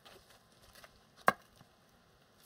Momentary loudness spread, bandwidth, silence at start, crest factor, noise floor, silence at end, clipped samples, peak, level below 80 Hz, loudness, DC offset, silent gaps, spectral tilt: 26 LU; 16 kHz; 1.25 s; 36 dB; -66 dBFS; 1.15 s; under 0.1%; -8 dBFS; -74 dBFS; -34 LUFS; under 0.1%; none; -3.5 dB/octave